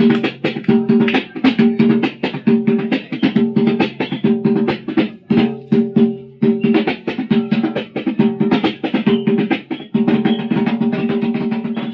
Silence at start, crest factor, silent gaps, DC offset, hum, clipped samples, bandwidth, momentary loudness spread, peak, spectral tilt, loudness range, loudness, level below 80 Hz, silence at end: 0 s; 14 dB; none; under 0.1%; none; under 0.1%; 5.8 kHz; 6 LU; -2 dBFS; -8.5 dB/octave; 2 LU; -17 LUFS; -56 dBFS; 0 s